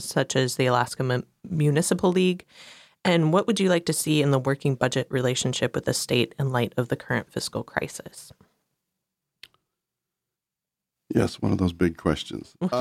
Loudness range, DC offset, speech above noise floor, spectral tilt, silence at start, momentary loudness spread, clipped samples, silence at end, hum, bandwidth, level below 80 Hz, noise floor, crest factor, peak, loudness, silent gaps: 11 LU; under 0.1%; 64 dB; -5 dB/octave; 0 s; 9 LU; under 0.1%; 0 s; none; 16 kHz; -54 dBFS; -88 dBFS; 20 dB; -6 dBFS; -25 LUFS; none